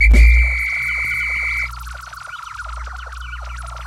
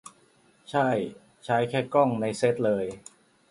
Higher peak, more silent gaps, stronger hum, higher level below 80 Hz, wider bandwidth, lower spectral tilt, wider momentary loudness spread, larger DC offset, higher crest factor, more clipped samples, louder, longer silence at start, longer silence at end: first, -2 dBFS vs -8 dBFS; neither; neither; first, -18 dBFS vs -66 dBFS; about the same, 12 kHz vs 11.5 kHz; about the same, -5 dB/octave vs -6 dB/octave; first, 19 LU vs 13 LU; neither; second, 14 dB vs 20 dB; neither; first, -16 LUFS vs -26 LUFS; second, 0 s vs 0.7 s; second, 0 s vs 0.5 s